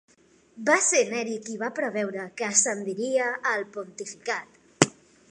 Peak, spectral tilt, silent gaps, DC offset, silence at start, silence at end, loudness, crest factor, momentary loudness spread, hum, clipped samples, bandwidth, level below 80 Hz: -2 dBFS; -2.5 dB/octave; none; under 0.1%; 0.55 s; 0.4 s; -25 LUFS; 26 dB; 11 LU; none; under 0.1%; 11.5 kHz; -72 dBFS